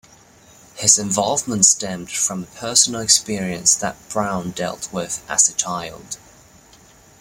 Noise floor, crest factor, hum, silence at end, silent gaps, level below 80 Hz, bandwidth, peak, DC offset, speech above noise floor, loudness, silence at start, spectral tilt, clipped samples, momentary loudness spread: -49 dBFS; 22 dB; none; 1.05 s; none; -54 dBFS; 16.5 kHz; 0 dBFS; under 0.1%; 29 dB; -17 LUFS; 0.75 s; -1.5 dB/octave; under 0.1%; 14 LU